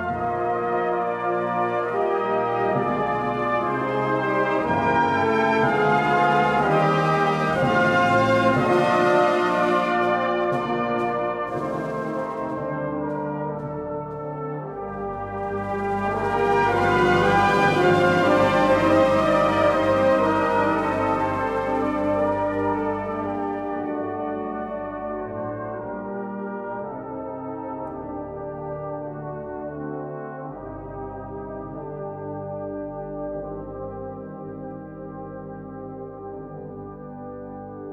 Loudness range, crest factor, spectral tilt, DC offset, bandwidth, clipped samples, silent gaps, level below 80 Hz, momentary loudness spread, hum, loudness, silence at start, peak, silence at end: 14 LU; 16 dB; -6.5 dB/octave; under 0.1%; 13.5 kHz; under 0.1%; none; -50 dBFS; 17 LU; none; -23 LUFS; 0 s; -6 dBFS; 0 s